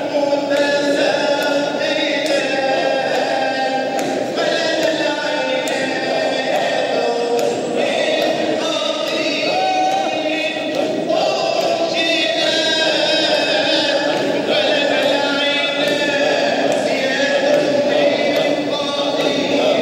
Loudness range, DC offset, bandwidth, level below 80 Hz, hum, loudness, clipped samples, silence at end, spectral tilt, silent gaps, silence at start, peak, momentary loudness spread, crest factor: 3 LU; under 0.1%; 16 kHz; -68 dBFS; none; -17 LUFS; under 0.1%; 0 s; -3 dB/octave; none; 0 s; -4 dBFS; 4 LU; 14 dB